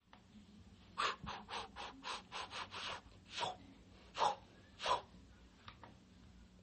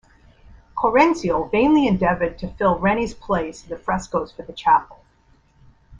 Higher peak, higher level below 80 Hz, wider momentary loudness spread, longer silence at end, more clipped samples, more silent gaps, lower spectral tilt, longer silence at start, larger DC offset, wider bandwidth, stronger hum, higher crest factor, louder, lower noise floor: second, -22 dBFS vs -2 dBFS; second, -68 dBFS vs -44 dBFS; first, 23 LU vs 10 LU; about the same, 0 s vs 0.05 s; neither; neither; second, -2.5 dB/octave vs -6.5 dB/octave; second, 0.15 s vs 0.75 s; neither; second, 8.4 kHz vs 9.8 kHz; neither; first, 24 dB vs 18 dB; second, -43 LUFS vs -20 LUFS; first, -63 dBFS vs -57 dBFS